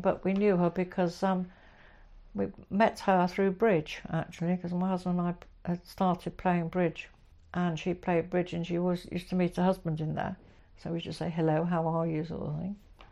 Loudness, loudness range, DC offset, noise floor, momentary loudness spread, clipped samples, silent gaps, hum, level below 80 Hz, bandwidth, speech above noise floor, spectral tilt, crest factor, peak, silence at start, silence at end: -31 LUFS; 3 LU; under 0.1%; -55 dBFS; 11 LU; under 0.1%; none; none; -56 dBFS; 12 kHz; 25 dB; -7.5 dB/octave; 18 dB; -12 dBFS; 0 s; 0.05 s